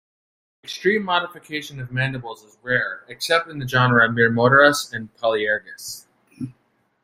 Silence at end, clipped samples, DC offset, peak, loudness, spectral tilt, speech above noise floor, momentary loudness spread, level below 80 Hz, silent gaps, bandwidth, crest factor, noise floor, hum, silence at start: 0.5 s; under 0.1%; under 0.1%; -2 dBFS; -20 LUFS; -4.5 dB/octave; 45 dB; 21 LU; -58 dBFS; none; 16 kHz; 20 dB; -66 dBFS; none; 0.65 s